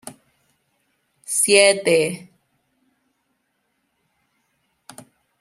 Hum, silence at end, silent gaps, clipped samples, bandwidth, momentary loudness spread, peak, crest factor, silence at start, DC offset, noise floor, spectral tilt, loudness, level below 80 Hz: none; 3.25 s; none; under 0.1%; 14.5 kHz; 26 LU; 0 dBFS; 24 dB; 0.05 s; under 0.1%; -71 dBFS; -2 dB/octave; -16 LUFS; -72 dBFS